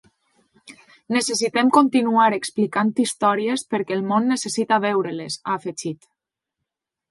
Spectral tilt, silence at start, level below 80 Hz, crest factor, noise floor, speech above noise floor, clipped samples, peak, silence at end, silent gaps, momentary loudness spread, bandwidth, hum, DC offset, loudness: -4 dB/octave; 0.65 s; -70 dBFS; 20 dB; -83 dBFS; 62 dB; under 0.1%; -2 dBFS; 1.15 s; none; 10 LU; 11.5 kHz; none; under 0.1%; -21 LUFS